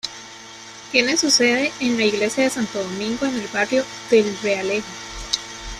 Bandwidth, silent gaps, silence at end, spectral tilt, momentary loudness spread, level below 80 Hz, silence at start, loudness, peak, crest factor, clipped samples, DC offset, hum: 14.5 kHz; none; 0 s; -2.5 dB/octave; 17 LU; -48 dBFS; 0.05 s; -20 LUFS; -2 dBFS; 20 dB; under 0.1%; under 0.1%; none